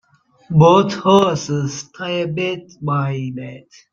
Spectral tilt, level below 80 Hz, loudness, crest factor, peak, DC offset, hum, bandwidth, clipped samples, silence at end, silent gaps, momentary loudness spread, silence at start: -6 dB/octave; -54 dBFS; -17 LUFS; 16 dB; -2 dBFS; under 0.1%; none; 7.4 kHz; under 0.1%; 0.35 s; none; 15 LU; 0.5 s